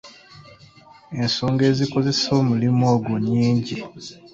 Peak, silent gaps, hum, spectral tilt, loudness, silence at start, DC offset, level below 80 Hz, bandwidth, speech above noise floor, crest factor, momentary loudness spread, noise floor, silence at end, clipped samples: -6 dBFS; none; none; -6 dB/octave; -20 LUFS; 0.05 s; under 0.1%; -56 dBFS; 7.8 kHz; 28 dB; 16 dB; 13 LU; -48 dBFS; 0.05 s; under 0.1%